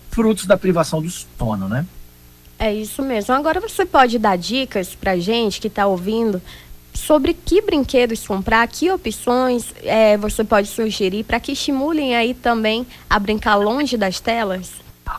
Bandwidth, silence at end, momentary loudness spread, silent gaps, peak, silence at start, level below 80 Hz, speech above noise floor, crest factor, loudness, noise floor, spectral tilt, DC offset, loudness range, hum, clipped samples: 16 kHz; 0 s; 8 LU; none; -2 dBFS; 0.05 s; -38 dBFS; 27 dB; 16 dB; -18 LUFS; -45 dBFS; -4.5 dB/octave; under 0.1%; 3 LU; 60 Hz at -45 dBFS; under 0.1%